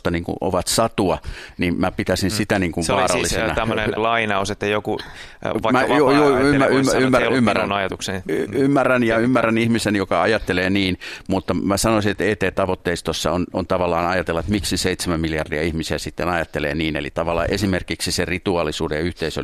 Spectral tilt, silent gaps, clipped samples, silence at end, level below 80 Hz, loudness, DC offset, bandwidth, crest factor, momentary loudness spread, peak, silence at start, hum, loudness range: -4.5 dB/octave; none; under 0.1%; 0 s; -40 dBFS; -20 LUFS; under 0.1%; 14.5 kHz; 18 dB; 7 LU; 0 dBFS; 0.05 s; none; 5 LU